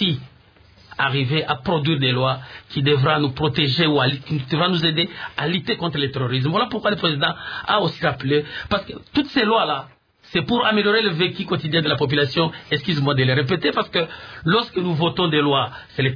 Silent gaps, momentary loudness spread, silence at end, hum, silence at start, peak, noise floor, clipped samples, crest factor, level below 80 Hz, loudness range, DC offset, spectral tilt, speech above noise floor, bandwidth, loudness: none; 7 LU; 0 s; none; 0 s; -4 dBFS; -51 dBFS; under 0.1%; 16 dB; -52 dBFS; 2 LU; under 0.1%; -7.5 dB/octave; 31 dB; 5.4 kHz; -20 LUFS